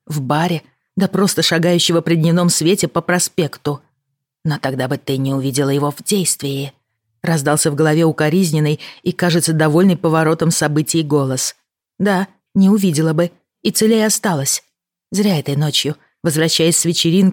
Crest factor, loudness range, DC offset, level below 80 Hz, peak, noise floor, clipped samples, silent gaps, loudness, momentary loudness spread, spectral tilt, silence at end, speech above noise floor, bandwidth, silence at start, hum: 14 dB; 4 LU; under 0.1%; -58 dBFS; -2 dBFS; -74 dBFS; under 0.1%; none; -16 LUFS; 9 LU; -4.5 dB/octave; 0 s; 59 dB; 17.5 kHz; 0.1 s; none